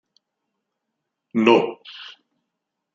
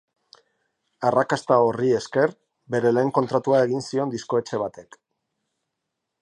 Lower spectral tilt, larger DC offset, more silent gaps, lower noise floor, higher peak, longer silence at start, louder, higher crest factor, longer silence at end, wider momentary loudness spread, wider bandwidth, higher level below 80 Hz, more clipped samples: about the same, -6 dB/octave vs -6 dB/octave; neither; neither; about the same, -81 dBFS vs -81 dBFS; first, -2 dBFS vs -6 dBFS; first, 1.35 s vs 1 s; first, -19 LUFS vs -22 LUFS; first, 24 dB vs 18 dB; second, 0.85 s vs 1.4 s; first, 22 LU vs 7 LU; second, 7.4 kHz vs 11 kHz; second, -74 dBFS vs -68 dBFS; neither